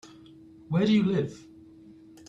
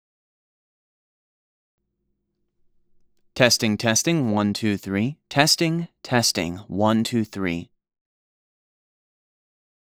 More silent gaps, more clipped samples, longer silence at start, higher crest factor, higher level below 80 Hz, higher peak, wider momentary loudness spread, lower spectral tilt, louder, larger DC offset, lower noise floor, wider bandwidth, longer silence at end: neither; neither; second, 0.05 s vs 3.35 s; second, 16 dB vs 26 dB; about the same, -64 dBFS vs -60 dBFS; second, -12 dBFS vs 0 dBFS; first, 15 LU vs 10 LU; first, -7.5 dB/octave vs -4 dB/octave; second, -26 LUFS vs -21 LUFS; neither; second, -51 dBFS vs -75 dBFS; second, 8 kHz vs over 20 kHz; second, 0.9 s vs 2.35 s